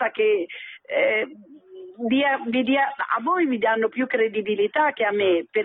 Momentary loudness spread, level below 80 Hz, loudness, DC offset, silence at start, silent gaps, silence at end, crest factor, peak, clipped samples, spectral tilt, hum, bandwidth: 7 LU; -74 dBFS; -22 LUFS; under 0.1%; 0 s; none; 0 s; 12 dB; -10 dBFS; under 0.1%; -9 dB/octave; none; 4 kHz